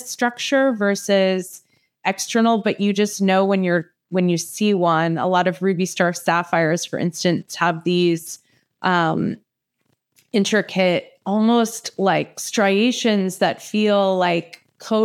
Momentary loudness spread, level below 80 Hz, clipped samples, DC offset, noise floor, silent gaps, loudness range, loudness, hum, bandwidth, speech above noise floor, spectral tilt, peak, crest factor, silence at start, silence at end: 7 LU; -80 dBFS; under 0.1%; under 0.1%; -70 dBFS; none; 3 LU; -20 LUFS; none; 15.5 kHz; 51 dB; -5 dB/octave; -2 dBFS; 18 dB; 0 s; 0 s